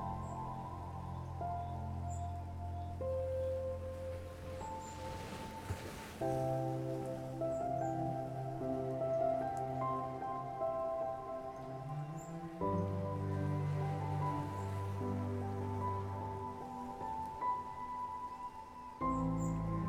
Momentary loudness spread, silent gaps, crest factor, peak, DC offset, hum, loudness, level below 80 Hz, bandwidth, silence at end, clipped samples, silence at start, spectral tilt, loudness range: 8 LU; none; 14 dB; -26 dBFS; under 0.1%; none; -40 LUFS; -58 dBFS; 16 kHz; 0 s; under 0.1%; 0 s; -7.5 dB/octave; 4 LU